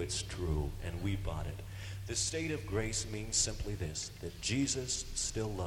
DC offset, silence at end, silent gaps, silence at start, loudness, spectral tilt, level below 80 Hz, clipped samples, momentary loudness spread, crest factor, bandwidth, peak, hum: under 0.1%; 0 s; none; 0 s; -36 LUFS; -3.5 dB/octave; -46 dBFS; under 0.1%; 9 LU; 18 dB; 16.5 kHz; -18 dBFS; none